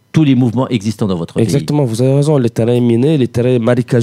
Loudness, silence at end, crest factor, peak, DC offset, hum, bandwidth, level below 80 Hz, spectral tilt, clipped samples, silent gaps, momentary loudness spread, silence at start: -13 LUFS; 0 s; 12 dB; 0 dBFS; under 0.1%; none; 14 kHz; -48 dBFS; -7.5 dB/octave; under 0.1%; none; 5 LU; 0.15 s